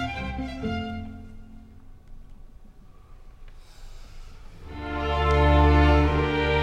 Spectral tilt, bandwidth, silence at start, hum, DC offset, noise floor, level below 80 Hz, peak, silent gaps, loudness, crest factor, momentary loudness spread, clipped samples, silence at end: -7.5 dB/octave; 7.4 kHz; 0 s; none; under 0.1%; -47 dBFS; -30 dBFS; -8 dBFS; none; -23 LUFS; 18 dB; 22 LU; under 0.1%; 0 s